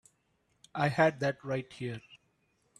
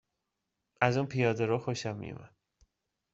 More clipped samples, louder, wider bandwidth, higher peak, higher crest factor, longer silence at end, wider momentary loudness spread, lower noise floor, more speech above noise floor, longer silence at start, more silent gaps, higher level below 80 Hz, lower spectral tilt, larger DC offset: neither; about the same, -32 LUFS vs -31 LUFS; first, 12.5 kHz vs 8 kHz; second, -12 dBFS vs -8 dBFS; about the same, 22 dB vs 26 dB; second, 0.65 s vs 0.85 s; about the same, 15 LU vs 14 LU; second, -75 dBFS vs -85 dBFS; second, 44 dB vs 54 dB; about the same, 0.75 s vs 0.8 s; neither; about the same, -70 dBFS vs -68 dBFS; about the same, -6.5 dB/octave vs -5.5 dB/octave; neither